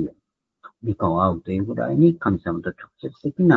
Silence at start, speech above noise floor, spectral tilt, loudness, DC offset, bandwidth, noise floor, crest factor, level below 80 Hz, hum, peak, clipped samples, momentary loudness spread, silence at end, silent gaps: 0 s; 49 dB; -10.5 dB/octave; -22 LUFS; under 0.1%; 4.2 kHz; -70 dBFS; 20 dB; -50 dBFS; none; -2 dBFS; under 0.1%; 14 LU; 0 s; none